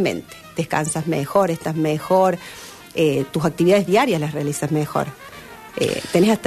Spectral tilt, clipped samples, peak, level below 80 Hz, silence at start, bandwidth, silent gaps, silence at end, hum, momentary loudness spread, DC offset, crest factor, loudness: -5.5 dB/octave; under 0.1%; -6 dBFS; -54 dBFS; 0 s; 13.5 kHz; none; 0 s; none; 15 LU; under 0.1%; 14 dB; -20 LUFS